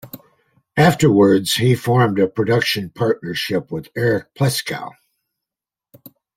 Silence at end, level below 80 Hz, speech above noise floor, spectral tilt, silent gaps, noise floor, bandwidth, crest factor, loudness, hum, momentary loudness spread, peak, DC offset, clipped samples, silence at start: 1.45 s; -54 dBFS; 71 dB; -5.5 dB/octave; none; -88 dBFS; 16.5 kHz; 18 dB; -17 LUFS; none; 13 LU; 0 dBFS; under 0.1%; under 0.1%; 0.05 s